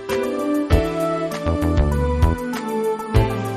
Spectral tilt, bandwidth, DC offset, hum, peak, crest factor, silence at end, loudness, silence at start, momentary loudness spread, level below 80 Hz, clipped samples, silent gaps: -7 dB/octave; 13.5 kHz; under 0.1%; none; -2 dBFS; 18 dB; 0 s; -21 LUFS; 0 s; 4 LU; -26 dBFS; under 0.1%; none